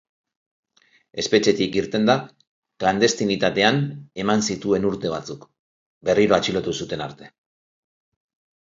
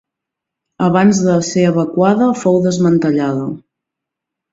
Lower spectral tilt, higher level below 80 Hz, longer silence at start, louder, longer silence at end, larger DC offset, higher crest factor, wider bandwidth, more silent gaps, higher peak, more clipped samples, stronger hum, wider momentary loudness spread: second, -4.5 dB/octave vs -6.5 dB/octave; about the same, -56 dBFS vs -54 dBFS; first, 1.15 s vs 0.8 s; second, -21 LUFS vs -14 LUFS; first, 1.35 s vs 0.95 s; neither; first, 22 dB vs 14 dB; about the same, 7.8 kHz vs 7.8 kHz; first, 2.47-2.62 s, 5.59-6.01 s vs none; about the same, -2 dBFS vs 0 dBFS; neither; neither; first, 12 LU vs 7 LU